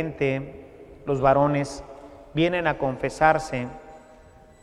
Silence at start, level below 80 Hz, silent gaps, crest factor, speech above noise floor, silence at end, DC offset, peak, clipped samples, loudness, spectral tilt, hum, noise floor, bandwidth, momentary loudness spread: 0 s; -48 dBFS; none; 22 dB; 27 dB; 0.65 s; under 0.1%; -4 dBFS; under 0.1%; -24 LUFS; -6.5 dB/octave; none; -50 dBFS; 12 kHz; 21 LU